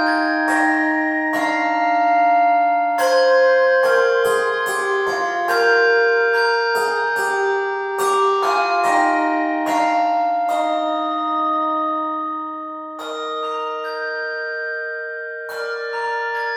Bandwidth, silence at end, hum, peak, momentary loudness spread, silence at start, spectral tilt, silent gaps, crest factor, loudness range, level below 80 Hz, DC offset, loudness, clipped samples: 17 kHz; 0 s; none; -4 dBFS; 10 LU; 0 s; -2 dB/octave; none; 14 dB; 9 LU; -76 dBFS; under 0.1%; -18 LUFS; under 0.1%